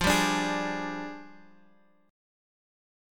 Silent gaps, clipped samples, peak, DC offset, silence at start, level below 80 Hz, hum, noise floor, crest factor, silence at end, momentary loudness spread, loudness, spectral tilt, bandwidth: none; under 0.1%; -10 dBFS; under 0.1%; 0 s; -50 dBFS; none; -63 dBFS; 22 dB; 1 s; 17 LU; -29 LUFS; -3.5 dB/octave; 17.5 kHz